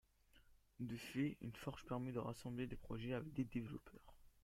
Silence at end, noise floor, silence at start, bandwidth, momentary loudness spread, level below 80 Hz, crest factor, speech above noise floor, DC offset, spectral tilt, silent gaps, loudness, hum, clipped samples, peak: 0.15 s; -71 dBFS; 0.35 s; 16 kHz; 9 LU; -66 dBFS; 18 dB; 24 dB; under 0.1%; -7 dB/octave; none; -48 LUFS; none; under 0.1%; -30 dBFS